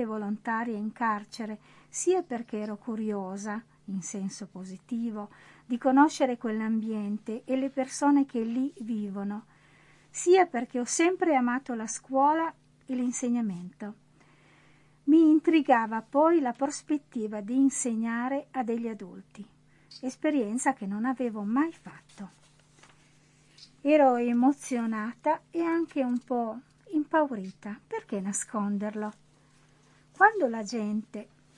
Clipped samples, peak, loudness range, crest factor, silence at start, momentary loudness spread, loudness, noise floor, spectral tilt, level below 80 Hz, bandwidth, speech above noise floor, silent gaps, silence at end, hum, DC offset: under 0.1%; -8 dBFS; 7 LU; 22 dB; 0 s; 17 LU; -28 LUFS; -61 dBFS; -4.5 dB/octave; -74 dBFS; 11.5 kHz; 33 dB; none; 0.35 s; none; under 0.1%